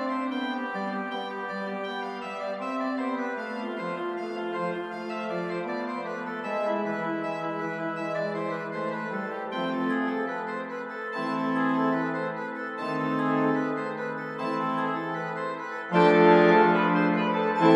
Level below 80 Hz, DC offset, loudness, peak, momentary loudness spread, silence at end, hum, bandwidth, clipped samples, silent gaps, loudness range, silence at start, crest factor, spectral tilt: -78 dBFS; under 0.1%; -28 LUFS; -6 dBFS; 11 LU; 0 s; none; 11 kHz; under 0.1%; none; 9 LU; 0 s; 20 dB; -7 dB/octave